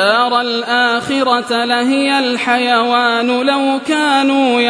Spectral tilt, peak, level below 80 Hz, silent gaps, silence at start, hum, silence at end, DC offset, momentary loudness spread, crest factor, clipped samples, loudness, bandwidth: -3 dB/octave; 0 dBFS; -62 dBFS; none; 0 s; none; 0 s; under 0.1%; 3 LU; 14 dB; under 0.1%; -13 LUFS; 11 kHz